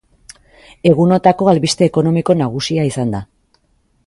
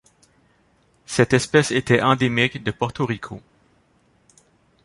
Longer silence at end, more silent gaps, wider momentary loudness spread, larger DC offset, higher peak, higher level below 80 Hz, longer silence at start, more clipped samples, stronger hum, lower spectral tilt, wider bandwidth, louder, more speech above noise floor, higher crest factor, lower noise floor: second, 0.8 s vs 1.45 s; neither; second, 7 LU vs 11 LU; neither; about the same, 0 dBFS vs -2 dBFS; about the same, -48 dBFS vs -52 dBFS; second, 0.85 s vs 1.1 s; neither; neither; about the same, -6 dB/octave vs -5 dB/octave; about the same, 11.5 kHz vs 11.5 kHz; first, -14 LUFS vs -20 LUFS; first, 46 dB vs 41 dB; second, 16 dB vs 22 dB; about the same, -59 dBFS vs -61 dBFS